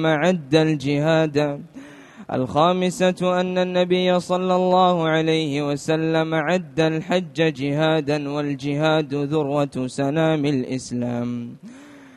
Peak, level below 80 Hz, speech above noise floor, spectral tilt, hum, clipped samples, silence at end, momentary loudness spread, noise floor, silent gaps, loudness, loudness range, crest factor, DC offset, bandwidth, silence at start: -2 dBFS; -60 dBFS; 21 dB; -6 dB/octave; none; under 0.1%; 0.1 s; 8 LU; -42 dBFS; none; -21 LUFS; 3 LU; 18 dB; under 0.1%; 12 kHz; 0 s